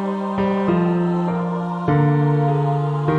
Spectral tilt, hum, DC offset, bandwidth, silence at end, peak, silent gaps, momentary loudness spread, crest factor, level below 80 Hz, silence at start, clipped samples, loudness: -9.5 dB/octave; none; under 0.1%; 5 kHz; 0 s; -6 dBFS; none; 6 LU; 12 dB; -52 dBFS; 0 s; under 0.1%; -19 LUFS